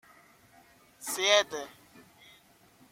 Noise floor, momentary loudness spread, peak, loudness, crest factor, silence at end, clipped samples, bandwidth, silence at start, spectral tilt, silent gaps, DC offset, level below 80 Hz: -61 dBFS; 19 LU; -8 dBFS; -27 LUFS; 26 dB; 1.2 s; under 0.1%; 16.5 kHz; 1 s; 0 dB/octave; none; under 0.1%; -76 dBFS